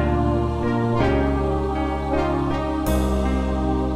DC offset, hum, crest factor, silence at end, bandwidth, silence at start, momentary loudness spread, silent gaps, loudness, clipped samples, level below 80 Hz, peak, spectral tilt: under 0.1%; none; 14 dB; 0 s; 15.5 kHz; 0 s; 3 LU; none; -22 LUFS; under 0.1%; -26 dBFS; -8 dBFS; -7.5 dB/octave